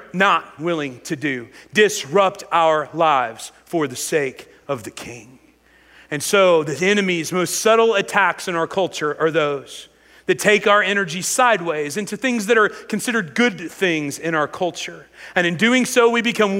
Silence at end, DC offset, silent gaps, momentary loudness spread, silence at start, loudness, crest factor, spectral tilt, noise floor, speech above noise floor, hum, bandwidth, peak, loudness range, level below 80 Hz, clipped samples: 0 s; under 0.1%; none; 13 LU; 0 s; -19 LUFS; 18 dB; -3.5 dB/octave; -53 dBFS; 34 dB; none; 16 kHz; -2 dBFS; 4 LU; -64 dBFS; under 0.1%